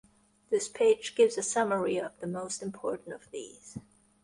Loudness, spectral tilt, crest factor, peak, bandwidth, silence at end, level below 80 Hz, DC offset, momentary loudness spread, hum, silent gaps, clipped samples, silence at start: -30 LUFS; -3.5 dB/octave; 18 dB; -14 dBFS; 11.5 kHz; 0.45 s; -70 dBFS; under 0.1%; 18 LU; none; none; under 0.1%; 0.5 s